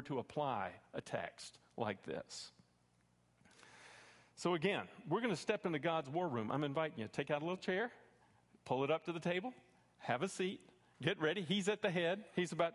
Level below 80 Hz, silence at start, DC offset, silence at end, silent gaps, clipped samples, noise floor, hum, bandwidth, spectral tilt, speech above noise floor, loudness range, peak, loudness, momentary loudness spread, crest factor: -78 dBFS; 0 s; under 0.1%; 0 s; none; under 0.1%; -75 dBFS; none; 11.5 kHz; -5 dB/octave; 35 dB; 8 LU; -20 dBFS; -40 LUFS; 14 LU; 22 dB